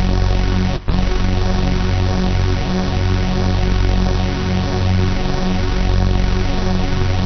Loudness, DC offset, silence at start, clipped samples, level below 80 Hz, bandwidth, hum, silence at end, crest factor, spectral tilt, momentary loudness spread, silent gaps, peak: -18 LUFS; under 0.1%; 0 s; under 0.1%; -18 dBFS; 6.4 kHz; none; 0 s; 10 dB; -6 dB/octave; 2 LU; none; -4 dBFS